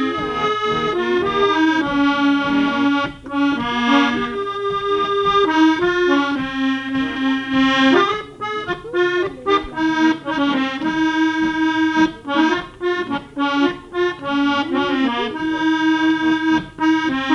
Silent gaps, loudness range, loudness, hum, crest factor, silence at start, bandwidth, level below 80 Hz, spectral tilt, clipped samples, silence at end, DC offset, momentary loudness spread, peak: none; 2 LU; -18 LUFS; none; 16 dB; 0 s; 8 kHz; -48 dBFS; -5 dB/octave; under 0.1%; 0 s; under 0.1%; 6 LU; -2 dBFS